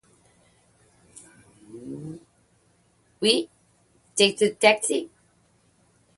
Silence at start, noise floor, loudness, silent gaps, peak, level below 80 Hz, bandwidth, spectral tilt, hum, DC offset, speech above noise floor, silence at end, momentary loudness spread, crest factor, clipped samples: 1.7 s; -64 dBFS; -22 LUFS; none; -2 dBFS; -70 dBFS; 11.5 kHz; -2.5 dB/octave; none; under 0.1%; 43 dB; 1.1 s; 24 LU; 26 dB; under 0.1%